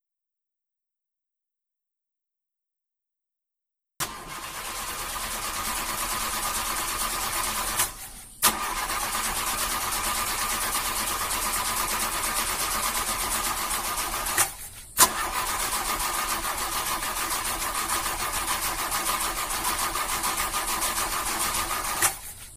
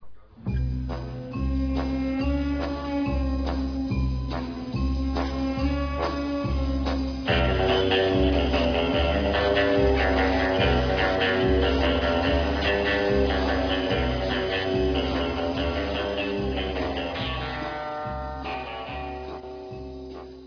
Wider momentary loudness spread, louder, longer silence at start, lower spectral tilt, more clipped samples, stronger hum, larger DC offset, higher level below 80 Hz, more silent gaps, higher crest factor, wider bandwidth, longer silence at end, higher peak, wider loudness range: second, 6 LU vs 11 LU; about the same, -26 LUFS vs -25 LUFS; first, 4 s vs 0 s; second, -0.5 dB/octave vs -7 dB/octave; neither; neither; neither; second, -44 dBFS vs -32 dBFS; neither; first, 28 dB vs 14 dB; first, 16.5 kHz vs 5.4 kHz; about the same, 0 s vs 0 s; first, -2 dBFS vs -10 dBFS; about the same, 8 LU vs 7 LU